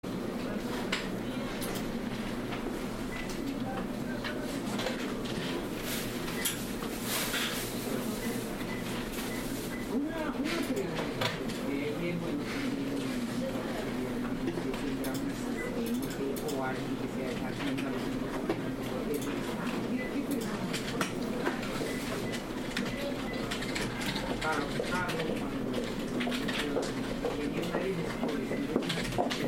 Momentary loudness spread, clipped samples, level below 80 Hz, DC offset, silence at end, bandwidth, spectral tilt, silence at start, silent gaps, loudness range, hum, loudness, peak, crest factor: 4 LU; under 0.1%; -50 dBFS; under 0.1%; 0 s; 16.5 kHz; -4.5 dB/octave; 0.05 s; none; 2 LU; none; -34 LUFS; -14 dBFS; 20 dB